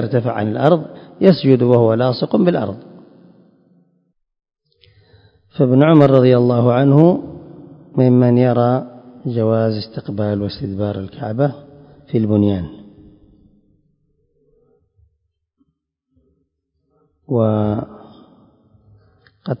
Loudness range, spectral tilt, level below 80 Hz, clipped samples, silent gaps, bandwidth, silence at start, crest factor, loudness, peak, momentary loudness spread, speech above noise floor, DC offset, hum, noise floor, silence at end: 11 LU; -10.5 dB/octave; -50 dBFS; under 0.1%; none; 5.4 kHz; 0 s; 18 dB; -15 LUFS; 0 dBFS; 16 LU; 57 dB; under 0.1%; none; -71 dBFS; 0.05 s